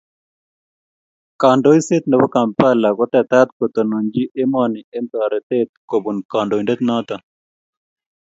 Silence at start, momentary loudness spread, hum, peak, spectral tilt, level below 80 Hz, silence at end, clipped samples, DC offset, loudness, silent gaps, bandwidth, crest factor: 1.4 s; 8 LU; none; 0 dBFS; -6.5 dB/octave; -60 dBFS; 1.1 s; under 0.1%; under 0.1%; -17 LUFS; 3.52-3.60 s, 4.84-4.92 s, 5.43-5.50 s, 5.69-5.88 s, 6.25-6.29 s; 8 kHz; 18 dB